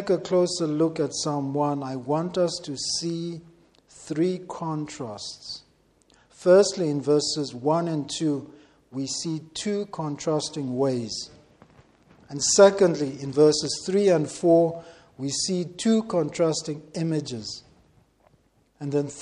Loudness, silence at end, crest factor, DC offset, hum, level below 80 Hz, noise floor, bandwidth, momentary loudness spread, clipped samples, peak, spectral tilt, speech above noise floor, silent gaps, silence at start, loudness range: -24 LUFS; 0 s; 22 dB; under 0.1%; none; -64 dBFS; -63 dBFS; 11.5 kHz; 15 LU; under 0.1%; -4 dBFS; -4.5 dB/octave; 39 dB; none; 0 s; 8 LU